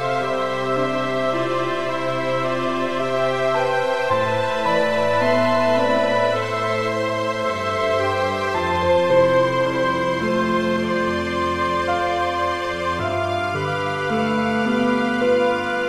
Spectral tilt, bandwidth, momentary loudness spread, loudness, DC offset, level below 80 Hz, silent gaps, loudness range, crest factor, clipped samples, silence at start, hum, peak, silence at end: -5.5 dB/octave; 13.5 kHz; 5 LU; -20 LUFS; under 0.1%; -52 dBFS; none; 3 LU; 16 dB; under 0.1%; 0 s; none; -4 dBFS; 0 s